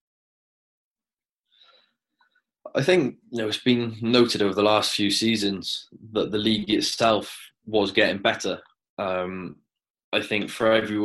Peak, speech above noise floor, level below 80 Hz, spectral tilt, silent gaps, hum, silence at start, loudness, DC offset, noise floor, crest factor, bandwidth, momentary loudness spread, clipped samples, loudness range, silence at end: -4 dBFS; over 67 dB; -62 dBFS; -4 dB/octave; 8.89-8.97 s, 9.90-9.94 s, 10.04-10.12 s; none; 2.65 s; -23 LUFS; under 0.1%; under -90 dBFS; 22 dB; 13 kHz; 12 LU; under 0.1%; 5 LU; 0 s